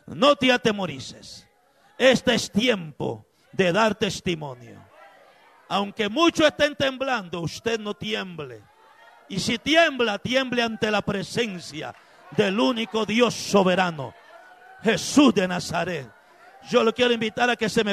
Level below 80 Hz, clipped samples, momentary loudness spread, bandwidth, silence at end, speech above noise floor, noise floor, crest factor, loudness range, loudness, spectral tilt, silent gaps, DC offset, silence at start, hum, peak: -58 dBFS; under 0.1%; 16 LU; 13.5 kHz; 0 s; 37 dB; -60 dBFS; 18 dB; 3 LU; -23 LUFS; -4 dB/octave; none; under 0.1%; 0.05 s; none; -6 dBFS